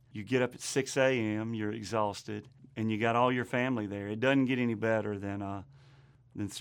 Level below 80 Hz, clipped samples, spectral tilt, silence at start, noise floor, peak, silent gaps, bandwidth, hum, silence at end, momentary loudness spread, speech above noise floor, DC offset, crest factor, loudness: -72 dBFS; under 0.1%; -5.5 dB/octave; 0.15 s; -59 dBFS; -14 dBFS; none; 19 kHz; none; 0 s; 13 LU; 28 dB; under 0.1%; 18 dB; -32 LUFS